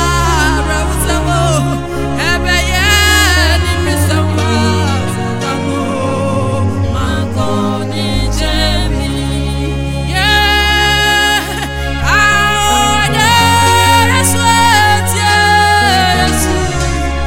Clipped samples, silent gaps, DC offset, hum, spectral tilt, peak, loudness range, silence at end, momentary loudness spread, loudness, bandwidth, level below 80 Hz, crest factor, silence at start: under 0.1%; none; under 0.1%; none; -3.5 dB/octave; 0 dBFS; 6 LU; 0 s; 8 LU; -11 LUFS; 17 kHz; -20 dBFS; 12 dB; 0 s